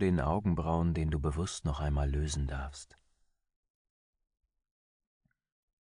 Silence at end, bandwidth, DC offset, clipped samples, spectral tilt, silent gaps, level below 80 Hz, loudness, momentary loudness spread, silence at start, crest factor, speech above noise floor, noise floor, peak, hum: 3 s; 10.5 kHz; under 0.1%; under 0.1%; -6.5 dB/octave; none; -40 dBFS; -33 LUFS; 8 LU; 0 s; 18 dB; 42 dB; -74 dBFS; -18 dBFS; none